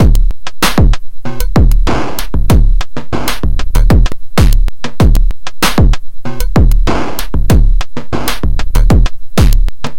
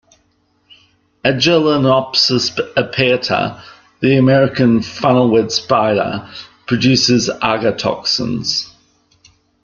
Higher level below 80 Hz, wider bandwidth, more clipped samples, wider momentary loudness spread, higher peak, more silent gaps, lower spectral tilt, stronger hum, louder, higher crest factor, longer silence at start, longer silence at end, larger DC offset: first, -10 dBFS vs -50 dBFS; first, 17 kHz vs 7.2 kHz; first, 0.2% vs under 0.1%; about the same, 9 LU vs 8 LU; about the same, 0 dBFS vs 0 dBFS; neither; about the same, -5.5 dB/octave vs -5 dB/octave; neither; about the same, -14 LUFS vs -14 LUFS; about the same, 10 dB vs 14 dB; second, 0 s vs 1.25 s; second, 0 s vs 0.95 s; first, 30% vs under 0.1%